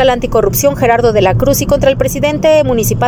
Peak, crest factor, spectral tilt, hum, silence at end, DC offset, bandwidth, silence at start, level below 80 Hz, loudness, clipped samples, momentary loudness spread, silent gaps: 0 dBFS; 10 dB; -5 dB/octave; none; 0 s; under 0.1%; 19.5 kHz; 0 s; -26 dBFS; -11 LUFS; under 0.1%; 3 LU; none